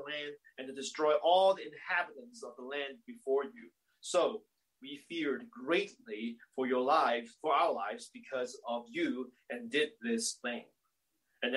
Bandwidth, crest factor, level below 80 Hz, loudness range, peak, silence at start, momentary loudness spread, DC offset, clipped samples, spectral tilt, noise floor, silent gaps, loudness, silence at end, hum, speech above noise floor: 12.5 kHz; 20 dB; -88 dBFS; 4 LU; -16 dBFS; 0 s; 17 LU; under 0.1%; under 0.1%; -2.5 dB/octave; -82 dBFS; none; -34 LUFS; 0 s; none; 48 dB